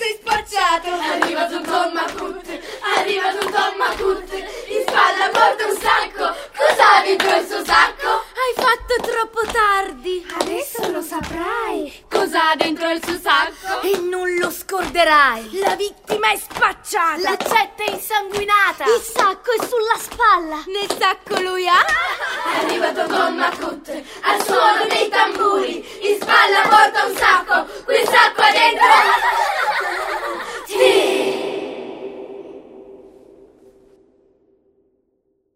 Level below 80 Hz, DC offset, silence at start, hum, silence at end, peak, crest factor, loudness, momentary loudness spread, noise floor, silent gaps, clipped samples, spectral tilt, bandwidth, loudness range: -48 dBFS; under 0.1%; 0 s; none; 2.5 s; 0 dBFS; 18 dB; -17 LUFS; 12 LU; -67 dBFS; none; under 0.1%; -1.5 dB/octave; 16 kHz; 7 LU